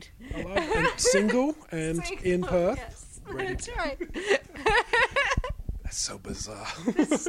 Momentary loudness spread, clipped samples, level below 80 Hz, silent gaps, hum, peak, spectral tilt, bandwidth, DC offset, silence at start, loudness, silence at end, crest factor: 14 LU; under 0.1%; -40 dBFS; none; none; -10 dBFS; -3.5 dB/octave; 16 kHz; under 0.1%; 0 s; -27 LUFS; 0 s; 18 dB